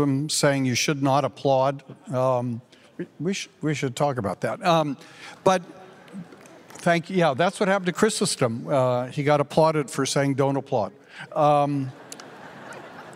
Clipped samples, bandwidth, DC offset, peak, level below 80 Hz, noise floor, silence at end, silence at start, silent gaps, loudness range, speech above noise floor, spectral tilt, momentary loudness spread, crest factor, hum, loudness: under 0.1%; 16 kHz; under 0.1%; -6 dBFS; -68 dBFS; -47 dBFS; 0 s; 0 s; none; 4 LU; 24 dB; -5 dB/octave; 19 LU; 18 dB; none; -23 LUFS